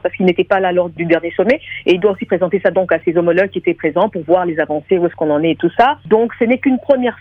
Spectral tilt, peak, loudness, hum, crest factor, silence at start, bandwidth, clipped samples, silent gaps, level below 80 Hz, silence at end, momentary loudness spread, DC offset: -8 dB/octave; 0 dBFS; -15 LUFS; none; 14 dB; 0.05 s; 6.2 kHz; under 0.1%; none; -50 dBFS; 0.05 s; 3 LU; under 0.1%